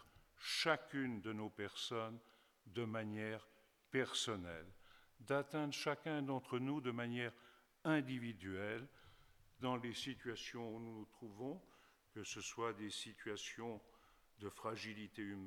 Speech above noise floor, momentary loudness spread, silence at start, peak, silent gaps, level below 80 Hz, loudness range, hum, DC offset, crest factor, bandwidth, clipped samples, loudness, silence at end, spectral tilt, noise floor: 23 dB; 13 LU; 0 s; -20 dBFS; none; -78 dBFS; 6 LU; none; under 0.1%; 26 dB; 19 kHz; under 0.1%; -45 LUFS; 0 s; -4.5 dB/octave; -68 dBFS